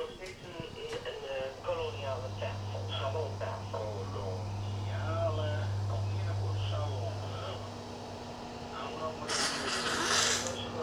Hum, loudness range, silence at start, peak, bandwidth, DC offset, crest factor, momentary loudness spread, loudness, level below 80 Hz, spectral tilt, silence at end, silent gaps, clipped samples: none; 5 LU; 0 s; -12 dBFS; 14.5 kHz; under 0.1%; 24 dB; 12 LU; -35 LUFS; -56 dBFS; -3.5 dB/octave; 0 s; none; under 0.1%